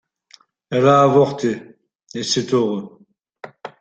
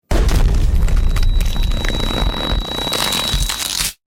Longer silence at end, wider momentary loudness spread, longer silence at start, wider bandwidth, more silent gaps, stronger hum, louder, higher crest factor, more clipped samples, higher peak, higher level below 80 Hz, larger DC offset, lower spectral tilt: about the same, 0.1 s vs 0.15 s; first, 22 LU vs 4 LU; first, 0.7 s vs 0.1 s; second, 9 kHz vs 17 kHz; first, 1.95-1.99 s vs none; neither; about the same, -17 LUFS vs -18 LUFS; first, 18 dB vs 12 dB; neither; about the same, -2 dBFS vs -4 dBFS; second, -60 dBFS vs -16 dBFS; neither; first, -5.5 dB/octave vs -3.5 dB/octave